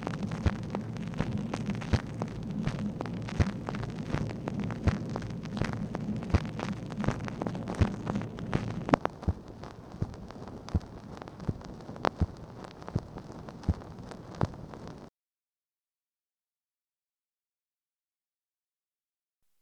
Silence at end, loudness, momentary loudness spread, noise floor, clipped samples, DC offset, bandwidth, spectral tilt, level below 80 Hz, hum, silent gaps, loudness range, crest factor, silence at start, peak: 4.5 s; -34 LUFS; 14 LU; under -90 dBFS; under 0.1%; under 0.1%; 10.5 kHz; -7 dB/octave; -44 dBFS; none; none; 7 LU; 30 dB; 0 s; -4 dBFS